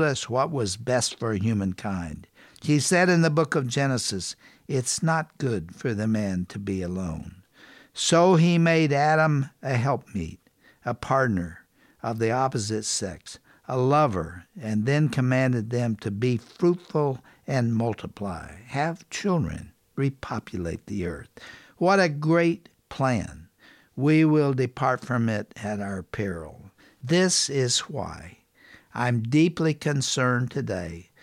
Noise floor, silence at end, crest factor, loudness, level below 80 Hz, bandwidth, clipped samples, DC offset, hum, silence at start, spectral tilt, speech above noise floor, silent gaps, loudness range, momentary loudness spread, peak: -56 dBFS; 0.2 s; 18 dB; -25 LUFS; -54 dBFS; 14 kHz; under 0.1%; under 0.1%; none; 0 s; -5 dB/octave; 32 dB; none; 5 LU; 16 LU; -8 dBFS